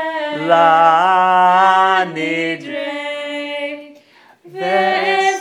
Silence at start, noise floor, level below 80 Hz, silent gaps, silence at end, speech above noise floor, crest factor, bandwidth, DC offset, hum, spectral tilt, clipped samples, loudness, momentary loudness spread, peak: 0 s; -48 dBFS; -80 dBFS; none; 0 s; 35 dB; 16 dB; 11.5 kHz; under 0.1%; none; -4 dB/octave; under 0.1%; -14 LUFS; 13 LU; 0 dBFS